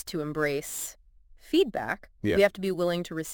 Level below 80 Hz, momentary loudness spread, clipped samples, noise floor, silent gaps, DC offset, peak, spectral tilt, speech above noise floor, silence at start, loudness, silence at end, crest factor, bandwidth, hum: -54 dBFS; 10 LU; under 0.1%; -54 dBFS; none; under 0.1%; -8 dBFS; -4.5 dB/octave; 26 dB; 0.05 s; -28 LUFS; 0 s; 20 dB; 17 kHz; none